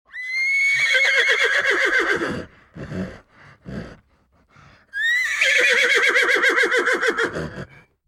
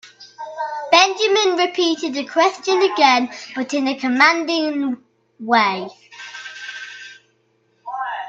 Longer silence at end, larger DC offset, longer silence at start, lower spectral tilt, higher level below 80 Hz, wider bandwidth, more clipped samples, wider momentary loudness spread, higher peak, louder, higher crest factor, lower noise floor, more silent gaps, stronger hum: first, 0.4 s vs 0 s; neither; about the same, 0.15 s vs 0.05 s; about the same, -2 dB/octave vs -2 dB/octave; first, -52 dBFS vs -72 dBFS; first, 16.5 kHz vs 8.2 kHz; neither; about the same, 19 LU vs 20 LU; second, -4 dBFS vs 0 dBFS; about the same, -17 LUFS vs -17 LUFS; about the same, 16 dB vs 20 dB; about the same, -60 dBFS vs -62 dBFS; neither; neither